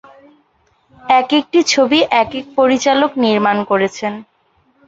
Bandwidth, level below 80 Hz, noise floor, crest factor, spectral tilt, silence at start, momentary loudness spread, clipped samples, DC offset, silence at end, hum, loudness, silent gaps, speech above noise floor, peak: 8 kHz; -56 dBFS; -58 dBFS; 16 dB; -3.5 dB/octave; 1.05 s; 10 LU; under 0.1%; under 0.1%; 0.65 s; none; -14 LUFS; none; 44 dB; 0 dBFS